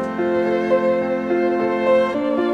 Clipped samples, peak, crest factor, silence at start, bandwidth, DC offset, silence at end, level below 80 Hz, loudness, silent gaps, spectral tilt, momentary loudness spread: under 0.1%; -6 dBFS; 12 dB; 0 s; 7.8 kHz; under 0.1%; 0 s; -56 dBFS; -19 LUFS; none; -7 dB/octave; 3 LU